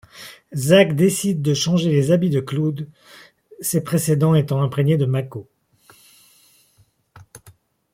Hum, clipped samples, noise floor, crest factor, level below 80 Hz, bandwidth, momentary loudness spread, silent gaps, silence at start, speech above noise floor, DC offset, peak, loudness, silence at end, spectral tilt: none; under 0.1%; -59 dBFS; 18 dB; -58 dBFS; 16.5 kHz; 17 LU; none; 0.15 s; 41 dB; under 0.1%; -2 dBFS; -19 LUFS; 0.55 s; -6 dB/octave